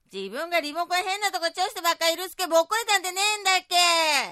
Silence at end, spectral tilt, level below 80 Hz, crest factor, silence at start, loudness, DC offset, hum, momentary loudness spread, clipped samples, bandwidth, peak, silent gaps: 0 s; 0.5 dB/octave; -72 dBFS; 18 dB; 0.15 s; -23 LUFS; under 0.1%; none; 7 LU; under 0.1%; 16 kHz; -8 dBFS; none